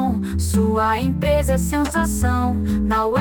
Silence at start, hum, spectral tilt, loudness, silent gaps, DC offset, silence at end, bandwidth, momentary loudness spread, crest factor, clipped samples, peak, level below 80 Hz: 0 s; none; -6 dB/octave; -20 LUFS; none; under 0.1%; 0 s; 18 kHz; 3 LU; 12 dB; under 0.1%; -6 dBFS; -26 dBFS